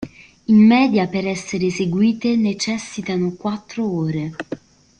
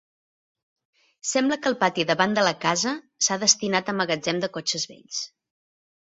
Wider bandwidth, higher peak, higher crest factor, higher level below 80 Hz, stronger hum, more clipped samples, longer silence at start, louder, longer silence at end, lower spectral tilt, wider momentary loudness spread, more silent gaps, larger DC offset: first, 9.4 kHz vs 8 kHz; about the same, -4 dBFS vs -4 dBFS; second, 14 dB vs 22 dB; first, -54 dBFS vs -68 dBFS; neither; neither; second, 0 s vs 1.25 s; first, -19 LUFS vs -23 LUFS; second, 0.45 s vs 0.85 s; first, -6 dB/octave vs -2.5 dB/octave; first, 17 LU vs 12 LU; neither; neither